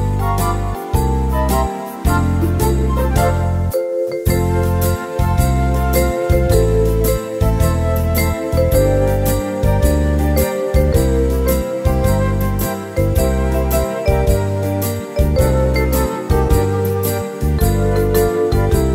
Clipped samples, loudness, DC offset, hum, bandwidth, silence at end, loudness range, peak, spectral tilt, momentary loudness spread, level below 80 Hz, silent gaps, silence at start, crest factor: under 0.1%; -17 LUFS; under 0.1%; none; 16.5 kHz; 0 s; 1 LU; 0 dBFS; -6.5 dB/octave; 4 LU; -20 dBFS; none; 0 s; 14 dB